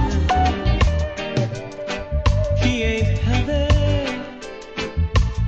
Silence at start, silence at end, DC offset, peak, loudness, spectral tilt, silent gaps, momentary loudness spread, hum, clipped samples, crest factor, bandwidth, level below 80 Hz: 0 s; 0 s; under 0.1%; -4 dBFS; -21 LUFS; -6 dB/octave; none; 10 LU; none; under 0.1%; 14 dB; 8 kHz; -24 dBFS